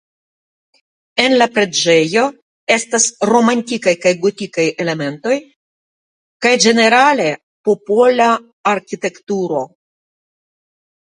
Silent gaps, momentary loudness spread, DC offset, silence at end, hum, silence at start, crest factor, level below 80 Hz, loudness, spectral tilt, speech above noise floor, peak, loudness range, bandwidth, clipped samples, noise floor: 2.42-2.67 s, 5.56-6.40 s, 7.43-7.64 s, 8.53-8.64 s, 9.23-9.27 s; 10 LU; under 0.1%; 1.5 s; none; 1.15 s; 16 dB; -64 dBFS; -14 LUFS; -3 dB/octave; over 76 dB; 0 dBFS; 4 LU; 10.5 kHz; under 0.1%; under -90 dBFS